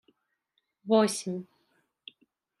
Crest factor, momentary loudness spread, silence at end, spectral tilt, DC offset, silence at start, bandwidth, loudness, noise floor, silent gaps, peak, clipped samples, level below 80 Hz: 22 dB; 26 LU; 1.15 s; -4.5 dB/octave; under 0.1%; 0.85 s; 14.5 kHz; -28 LUFS; -79 dBFS; none; -12 dBFS; under 0.1%; -84 dBFS